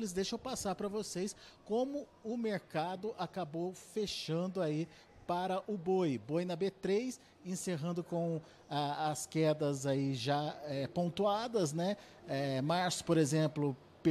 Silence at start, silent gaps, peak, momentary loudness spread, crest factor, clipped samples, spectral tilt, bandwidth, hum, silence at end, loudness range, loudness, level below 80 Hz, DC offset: 0 s; none; -20 dBFS; 8 LU; 16 dB; under 0.1%; -5.5 dB/octave; 13.5 kHz; none; 0 s; 4 LU; -37 LUFS; -70 dBFS; under 0.1%